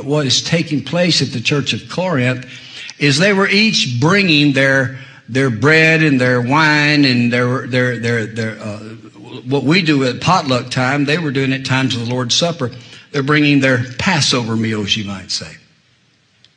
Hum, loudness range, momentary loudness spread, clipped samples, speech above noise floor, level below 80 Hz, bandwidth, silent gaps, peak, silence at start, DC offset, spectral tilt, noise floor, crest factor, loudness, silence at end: none; 4 LU; 12 LU; under 0.1%; 41 dB; -54 dBFS; 10.5 kHz; none; 0 dBFS; 0 s; under 0.1%; -4.5 dB/octave; -56 dBFS; 16 dB; -14 LUFS; 1 s